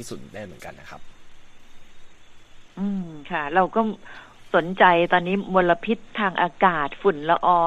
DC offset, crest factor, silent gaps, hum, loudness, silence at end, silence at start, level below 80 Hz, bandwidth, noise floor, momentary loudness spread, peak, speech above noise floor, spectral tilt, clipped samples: under 0.1%; 20 dB; none; none; -22 LUFS; 0 s; 0 s; -50 dBFS; 13 kHz; -43 dBFS; 21 LU; -2 dBFS; 21 dB; -6 dB/octave; under 0.1%